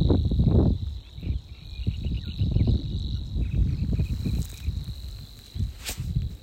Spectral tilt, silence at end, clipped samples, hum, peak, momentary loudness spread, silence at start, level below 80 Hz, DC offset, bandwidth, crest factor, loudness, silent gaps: -7.5 dB/octave; 0 s; under 0.1%; none; -8 dBFS; 14 LU; 0 s; -30 dBFS; under 0.1%; 16 kHz; 18 dB; -28 LUFS; none